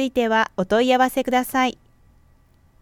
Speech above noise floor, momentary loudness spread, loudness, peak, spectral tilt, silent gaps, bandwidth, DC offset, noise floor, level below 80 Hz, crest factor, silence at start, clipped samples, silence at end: 36 dB; 4 LU; -20 LUFS; -6 dBFS; -4 dB/octave; none; 17.5 kHz; under 0.1%; -56 dBFS; -52 dBFS; 16 dB; 0 s; under 0.1%; 1.1 s